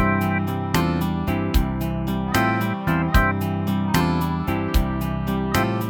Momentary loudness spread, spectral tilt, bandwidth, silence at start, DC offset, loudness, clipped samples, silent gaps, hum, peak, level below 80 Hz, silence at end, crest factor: 5 LU; -6 dB/octave; 19.5 kHz; 0 s; under 0.1%; -22 LUFS; under 0.1%; none; none; -4 dBFS; -30 dBFS; 0 s; 18 dB